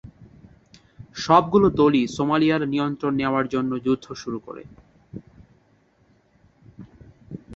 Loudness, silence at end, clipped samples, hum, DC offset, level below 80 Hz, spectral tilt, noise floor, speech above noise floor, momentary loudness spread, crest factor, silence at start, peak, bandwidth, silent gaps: -21 LUFS; 0 s; under 0.1%; none; under 0.1%; -52 dBFS; -6.5 dB/octave; -61 dBFS; 40 dB; 24 LU; 22 dB; 0.05 s; -2 dBFS; 7.8 kHz; none